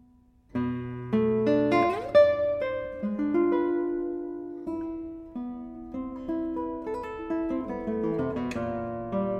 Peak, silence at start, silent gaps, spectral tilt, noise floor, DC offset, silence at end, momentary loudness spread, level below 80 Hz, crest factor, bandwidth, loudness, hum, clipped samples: -8 dBFS; 0.55 s; none; -8 dB/octave; -59 dBFS; under 0.1%; 0 s; 14 LU; -54 dBFS; 20 dB; 8.8 kHz; -28 LUFS; none; under 0.1%